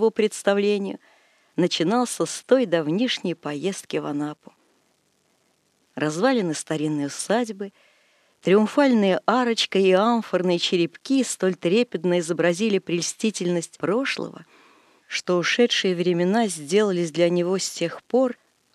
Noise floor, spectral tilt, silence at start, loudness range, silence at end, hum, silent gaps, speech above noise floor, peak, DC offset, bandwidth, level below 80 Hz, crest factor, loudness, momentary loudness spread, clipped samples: -66 dBFS; -4.5 dB/octave; 0 s; 7 LU; 0.4 s; none; none; 44 dB; -4 dBFS; under 0.1%; 13 kHz; -82 dBFS; 18 dB; -23 LUFS; 10 LU; under 0.1%